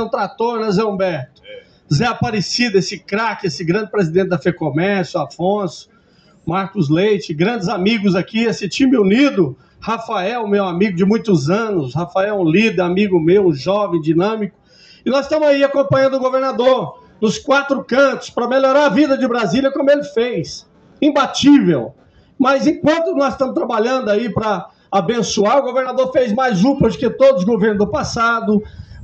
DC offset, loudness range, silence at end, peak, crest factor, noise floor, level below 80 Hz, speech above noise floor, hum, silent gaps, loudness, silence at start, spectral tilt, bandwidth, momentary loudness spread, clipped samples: under 0.1%; 4 LU; 0 s; -2 dBFS; 14 dB; -51 dBFS; -48 dBFS; 36 dB; none; none; -16 LUFS; 0 s; -6 dB/octave; 8.6 kHz; 8 LU; under 0.1%